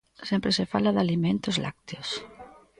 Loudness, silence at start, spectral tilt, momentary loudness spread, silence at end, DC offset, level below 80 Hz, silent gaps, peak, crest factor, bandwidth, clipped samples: -27 LUFS; 0.2 s; -5.5 dB/octave; 11 LU; 0.3 s; under 0.1%; -58 dBFS; none; -10 dBFS; 18 dB; 10.5 kHz; under 0.1%